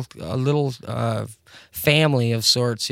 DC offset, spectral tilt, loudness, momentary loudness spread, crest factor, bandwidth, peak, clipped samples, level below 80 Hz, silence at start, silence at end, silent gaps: under 0.1%; -4.5 dB/octave; -21 LUFS; 12 LU; 20 dB; 17 kHz; -2 dBFS; under 0.1%; -54 dBFS; 0 s; 0 s; none